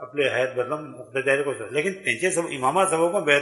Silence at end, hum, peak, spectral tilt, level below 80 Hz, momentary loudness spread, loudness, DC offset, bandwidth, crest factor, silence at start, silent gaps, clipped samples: 0 s; none; -4 dBFS; -3.5 dB/octave; -70 dBFS; 8 LU; -24 LUFS; under 0.1%; 11.5 kHz; 20 dB; 0 s; none; under 0.1%